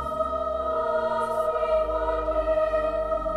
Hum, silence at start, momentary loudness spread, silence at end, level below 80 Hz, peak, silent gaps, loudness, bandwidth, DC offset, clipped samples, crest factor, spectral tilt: none; 0 s; 3 LU; 0 s; -40 dBFS; -14 dBFS; none; -26 LUFS; 12 kHz; under 0.1%; under 0.1%; 12 dB; -6.5 dB/octave